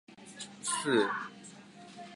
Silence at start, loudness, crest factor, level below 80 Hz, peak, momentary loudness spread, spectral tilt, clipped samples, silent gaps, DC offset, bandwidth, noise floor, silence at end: 0.1 s; -32 LUFS; 20 dB; -82 dBFS; -16 dBFS; 22 LU; -3 dB/octave; under 0.1%; none; under 0.1%; 11.5 kHz; -52 dBFS; 0 s